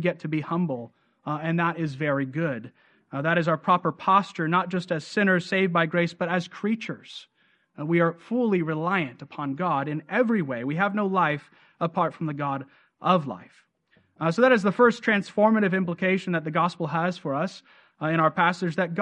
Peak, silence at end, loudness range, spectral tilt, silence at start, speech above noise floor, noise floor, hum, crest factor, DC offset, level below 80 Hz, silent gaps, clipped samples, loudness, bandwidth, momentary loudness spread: -6 dBFS; 0 s; 4 LU; -7 dB/octave; 0 s; 41 dB; -65 dBFS; none; 20 dB; under 0.1%; -72 dBFS; none; under 0.1%; -25 LUFS; 9.4 kHz; 12 LU